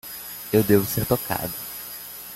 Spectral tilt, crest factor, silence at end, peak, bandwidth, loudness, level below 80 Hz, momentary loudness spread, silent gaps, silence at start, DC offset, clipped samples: -5.5 dB/octave; 20 dB; 0 s; -4 dBFS; 17 kHz; -24 LUFS; -50 dBFS; 15 LU; none; 0.05 s; under 0.1%; under 0.1%